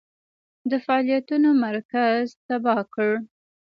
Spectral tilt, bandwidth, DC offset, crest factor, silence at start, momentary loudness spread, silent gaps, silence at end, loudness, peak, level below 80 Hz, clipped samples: -7 dB/octave; 6.8 kHz; under 0.1%; 16 dB; 0.65 s; 8 LU; 1.85-1.89 s, 2.37-2.49 s; 0.45 s; -23 LUFS; -8 dBFS; -74 dBFS; under 0.1%